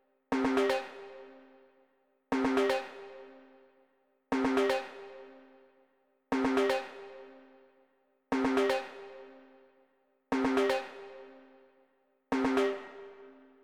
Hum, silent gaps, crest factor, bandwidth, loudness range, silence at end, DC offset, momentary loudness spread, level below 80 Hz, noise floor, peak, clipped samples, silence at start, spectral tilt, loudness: none; none; 18 dB; 14 kHz; 3 LU; 0.35 s; under 0.1%; 23 LU; -64 dBFS; -72 dBFS; -16 dBFS; under 0.1%; 0.3 s; -4.5 dB/octave; -31 LUFS